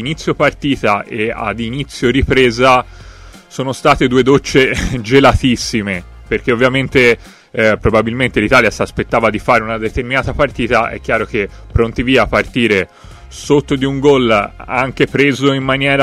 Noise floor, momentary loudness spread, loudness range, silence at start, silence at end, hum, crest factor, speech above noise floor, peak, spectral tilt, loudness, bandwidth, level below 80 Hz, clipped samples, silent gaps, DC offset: -36 dBFS; 9 LU; 2 LU; 0 s; 0 s; none; 14 dB; 23 dB; 0 dBFS; -5.5 dB/octave; -13 LUFS; 15 kHz; -30 dBFS; under 0.1%; none; under 0.1%